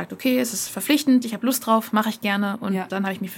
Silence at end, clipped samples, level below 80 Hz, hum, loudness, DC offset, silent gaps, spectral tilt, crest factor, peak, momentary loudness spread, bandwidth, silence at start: 0 s; under 0.1%; -70 dBFS; none; -22 LUFS; under 0.1%; none; -4 dB/octave; 16 dB; -6 dBFS; 7 LU; 17 kHz; 0 s